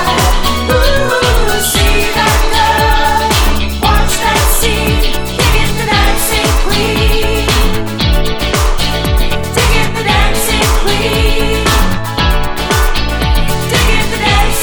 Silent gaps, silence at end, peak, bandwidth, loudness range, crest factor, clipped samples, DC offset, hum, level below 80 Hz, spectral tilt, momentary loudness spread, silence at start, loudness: none; 0 s; 0 dBFS; over 20 kHz; 2 LU; 10 dB; under 0.1%; under 0.1%; none; -14 dBFS; -3.5 dB/octave; 4 LU; 0 s; -12 LUFS